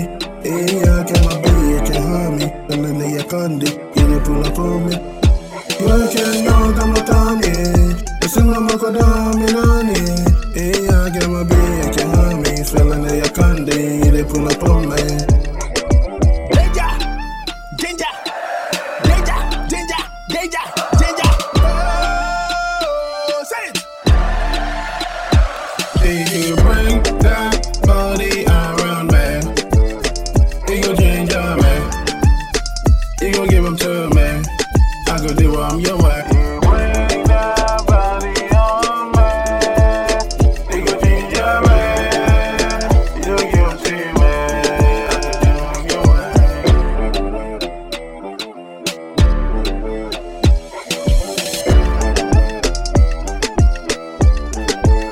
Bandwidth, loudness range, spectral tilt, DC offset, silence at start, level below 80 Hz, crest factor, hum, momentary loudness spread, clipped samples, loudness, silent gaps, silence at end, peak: 16 kHz; 4 LU; -5.5 dB/octave; under 0.1%; 0 s; -16 dBFS; 14 dB; none; 8 LU; under 0.1%; -16 LUFS; none; 0 s; 0 dBFS